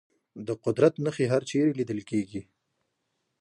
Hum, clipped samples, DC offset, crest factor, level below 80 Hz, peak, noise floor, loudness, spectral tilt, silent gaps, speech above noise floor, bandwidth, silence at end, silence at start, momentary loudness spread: none; under 0.1%; under 0.1%; 22 dB; -66 dBFS; -8 dBFS; -79 dBFS; -27 LUFS; -7 dB/octave; none; 52 dB; 11 kHz; 1 s; 0.35 s; 14 LU